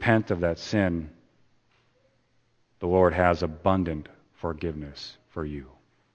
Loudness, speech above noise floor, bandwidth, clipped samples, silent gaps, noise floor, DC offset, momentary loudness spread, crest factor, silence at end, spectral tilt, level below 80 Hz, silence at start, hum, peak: -27 LUFS; 42 dB; 8.6 kHz; under 0.1%; none; -67 dBFS; under 0.1%; 16 LU; 24 dB; 0.45 s; -7 dB/octave; -48 dBFS; 0 s; none; -4 dBFS